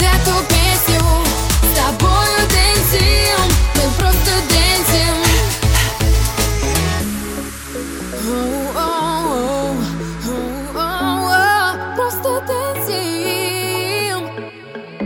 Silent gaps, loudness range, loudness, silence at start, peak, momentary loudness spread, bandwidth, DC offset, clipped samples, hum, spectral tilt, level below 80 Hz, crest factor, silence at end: none; 7 LU; -15 LUFS; 0 s; -2 dBFS; 11 LU; 17 kHz; under 0.1%; under 0.1%; none; -3.5 dB/octave; -22 dBFS; 14 dB; 0 s